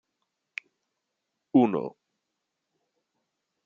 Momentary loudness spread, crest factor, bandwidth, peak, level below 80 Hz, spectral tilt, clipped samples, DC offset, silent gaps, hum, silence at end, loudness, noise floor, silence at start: 18 LU; 24 dB; 6.8 kHz; -8 dBFS; -80 dBFS; -6.5 dB/octave; under 0.1%; under 0.1%; none; none; 1.75 s; -25 LUFS; -83 dBFS; 1.55 s